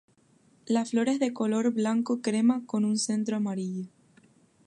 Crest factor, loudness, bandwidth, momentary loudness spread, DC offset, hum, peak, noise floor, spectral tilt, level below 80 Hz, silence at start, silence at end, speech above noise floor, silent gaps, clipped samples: 16 dB; -28 LUFS; 11.5 kHz; 7 LU; under 0.1%; none; -12 dBFS; -63 dBFS; -5 dB/octave; -80 dBFS; 0.65 s; 0.8 s; 36 dB; none; under 0.1%